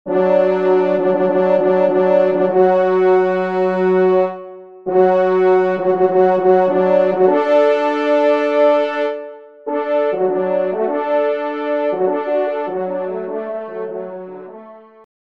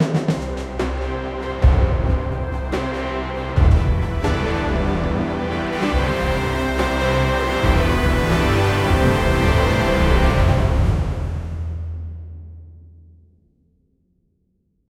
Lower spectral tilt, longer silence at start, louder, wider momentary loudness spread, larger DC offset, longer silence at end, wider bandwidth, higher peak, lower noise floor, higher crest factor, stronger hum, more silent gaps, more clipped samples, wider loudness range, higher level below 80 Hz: first, -8 dB/octave vs -6.5 dB/octave; about the same, 0.05 s vs 0 s; first, -16 LUFS vs -20 LUFS; first, 13 LU vs 10 LU; first, 0.2% vs under 0.1%; second, 0.45 s vs 2.2 s; second, 6 kHz vs 15 kHz; about the same, -2 dBFS vs -2 dBFS; second, -39 dBFS vs -66 dBFS; about the same, 14 dB vs 16 dB; neither; neither; neither; second, 6 LU vs 9 LU; second, -68 dBFS vs -24 dBFS